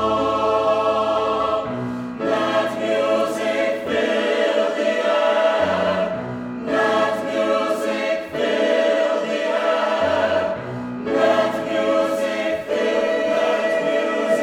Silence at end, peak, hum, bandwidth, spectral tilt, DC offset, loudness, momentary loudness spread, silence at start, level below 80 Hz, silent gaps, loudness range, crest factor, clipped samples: 0 s; -4 dBFS; none; 14 kHz; -4.5 dB/octave; under 0.1%; -20 LUFS; 5 LU; 0 s; -56 dBFS; none; 1 LU; 14 dB; under 0.1%